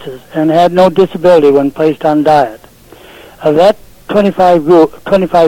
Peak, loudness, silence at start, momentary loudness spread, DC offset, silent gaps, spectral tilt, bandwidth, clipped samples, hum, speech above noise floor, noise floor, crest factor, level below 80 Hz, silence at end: 0 dBFS; -9 LUFS; 0 s; 8 LU; under 0.1%; none; -7 dB/octave; 16.5 kHz; 0.2%; none; 29 dB; -37 dBFS; 10 dB; -42 dBFS; 0 s